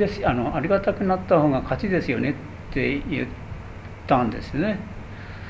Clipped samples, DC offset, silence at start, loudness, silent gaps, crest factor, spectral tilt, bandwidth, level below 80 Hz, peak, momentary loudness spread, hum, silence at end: under 0.1%; under 0.1%; 0 s; -24 LUFS; none; 20 dB; -8.5 dB/octave; 8 kHz; -40 dBFS; -4 dBFS; 18 LU; none; 0 s